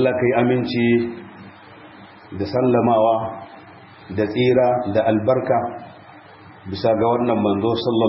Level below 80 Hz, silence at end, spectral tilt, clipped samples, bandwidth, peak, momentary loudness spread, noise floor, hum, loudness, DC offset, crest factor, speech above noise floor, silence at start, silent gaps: -56 dBFS; 0 s; -11.5 dB/octave; under 0.1%; 5.8 kHz; -4 dBFS; 19 LU; -43 dBFS; none; -19 LUFS; under 0.1%; 16 dB; 25 dB; 0 s; none